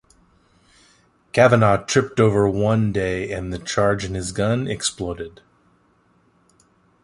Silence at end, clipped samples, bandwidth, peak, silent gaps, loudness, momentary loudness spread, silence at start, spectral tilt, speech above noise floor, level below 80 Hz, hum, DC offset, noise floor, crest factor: 1.75 s; under 0.1%; 11.5 kHz; -2 dBFS; none; -20 LUFS; 12 LU; 1.35 s; -5.5 dB/octave; 41 dB; -44 dBFS; none; under 0.1%; -60 dBFS; 20 dB